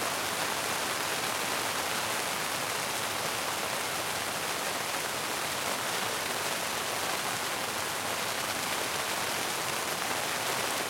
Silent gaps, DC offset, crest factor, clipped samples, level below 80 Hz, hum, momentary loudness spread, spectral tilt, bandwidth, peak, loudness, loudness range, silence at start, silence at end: none; under 0.1%; 20 dB; under 0.1%; -68 dBFS; none; 1 LU; -1 dB/octave; 16.5 kHz; -12 dBFS; -30 LUFS; 1 LU; 0 s; 0 s